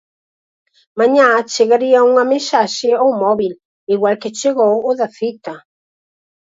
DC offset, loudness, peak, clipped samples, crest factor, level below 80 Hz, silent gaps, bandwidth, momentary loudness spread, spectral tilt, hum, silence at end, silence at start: under 0.1%; -14 LUFS; 0 dBFS; under 0.1%; 16 dB; -66 dBFS; 3.65-3.87 s; 8 kHz; 12 LU; -3.5 dB/octave; none; 0.9 s; 0.95 s